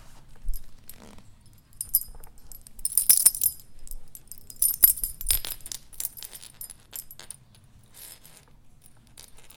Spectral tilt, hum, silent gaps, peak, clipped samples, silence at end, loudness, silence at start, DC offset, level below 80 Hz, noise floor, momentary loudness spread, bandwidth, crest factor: 0.5 dB/octave; none; none; 0 dBFS; under 0.1%; 0.1 s; -22 LUFS; 0.1 s; under 0.1%; -44 dBFS; -54 dBFS; 27 LU; 17.5 kHz; 30 dB